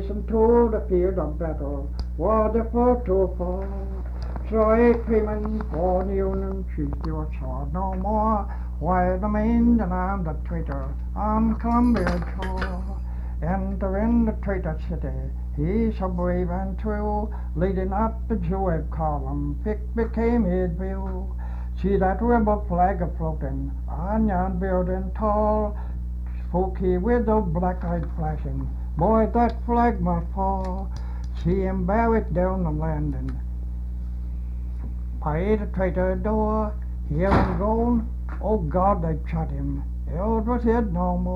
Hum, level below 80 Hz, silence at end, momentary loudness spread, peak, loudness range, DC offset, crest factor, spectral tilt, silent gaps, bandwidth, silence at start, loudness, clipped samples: 60 Hz at -30 dBFS; -28 dBFS; 0 s; 11 LU; -6 dBFS; 3 LU; under 0.1%; 18 dB; -10 dB/octave; none; 5.4 kHz; 0 s; -25 LUFS; under 0.1%